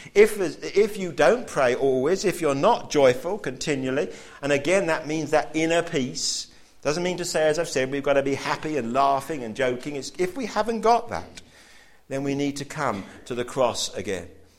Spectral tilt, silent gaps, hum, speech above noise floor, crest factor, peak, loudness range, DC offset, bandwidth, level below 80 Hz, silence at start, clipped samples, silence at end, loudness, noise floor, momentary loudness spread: -4 dB/octave; none; none; 27 dB; 20 dB; -4 dBFS; 5 LU; under 0.1%; 16 kHz; -52 dBFS; 0 s; under 0.1%; 0.15 s; -24 LUFS; -51 dBFS; 11 LU